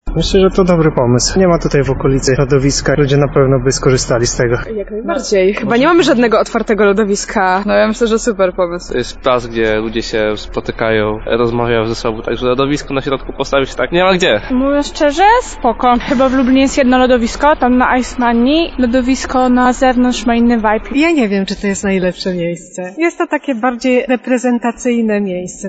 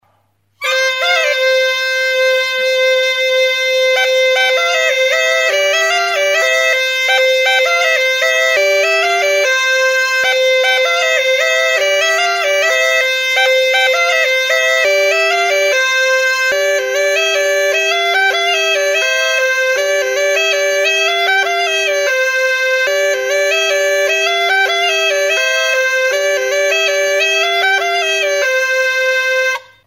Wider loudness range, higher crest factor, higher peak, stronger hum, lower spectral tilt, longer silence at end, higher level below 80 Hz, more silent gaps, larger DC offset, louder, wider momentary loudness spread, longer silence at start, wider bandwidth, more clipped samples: first, 4 LU vs 1 LU; about the same, 12 dB vs 12 dB; about the same, 0 dBFS vs -2 dBFS; neither; first, -5 dB/octave vs 1.5 dB/octave; second, 0 s vs 0.25 s; first, -30 dBFS vs -70 dBFS; neither; neither; about the same, -13 LUFS vs -12 LUFS; first, 7 LU vs 2 LU; second, 0.05 s vs 0.6 s; second, 9.2 kHz vs 16.5 kHz; neither